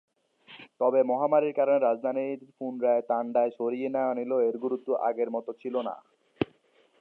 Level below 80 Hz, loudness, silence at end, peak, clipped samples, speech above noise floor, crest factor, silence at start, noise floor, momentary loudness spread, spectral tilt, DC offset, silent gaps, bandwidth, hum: -70 dBFS; -28 LUFS; 0.55 s; -10 dBFS; under 0.1%; 37 dB; 18 dB; 0.5 s; -64 dBFS; 11 LU; -9 dB/octave; under 0.1%; none; 4.3 kHz; none